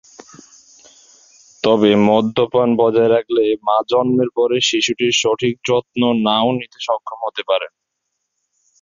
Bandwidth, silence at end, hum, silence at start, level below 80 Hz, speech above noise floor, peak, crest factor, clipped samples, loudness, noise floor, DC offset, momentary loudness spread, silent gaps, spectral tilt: 7.6 kHz; 1.15 s; none; 1.65 s; -58 dBFS; 59 dB; -2 dBFS; 16 dB; under 0.1%; -16 LUFS; -75 dBFS; under 0.1%; 9 LU; none; -4.5 dB/octave